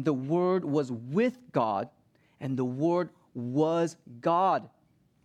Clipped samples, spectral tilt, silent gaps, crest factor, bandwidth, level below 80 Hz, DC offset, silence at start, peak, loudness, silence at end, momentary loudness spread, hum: under 0.1%; -7.5 dB/octave; none; 18 dB; 10 kHz; -76 dBFS; under 0.1%; 0 s; -12 dBFS; -29 LUFS; 0.55 s; 9 LU; none